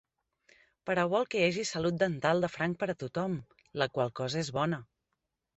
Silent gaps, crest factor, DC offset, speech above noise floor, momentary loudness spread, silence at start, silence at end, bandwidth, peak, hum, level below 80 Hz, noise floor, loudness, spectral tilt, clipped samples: none; 20 dB; under 0.1%; 53 dB; 7 LU; 0.85 s; 0.7 s; 8.2 kHz; -12 dBFS; none; -66 dBFS; -84 dBFS; -32 LUFS; -5 dB/octave; under 0.1%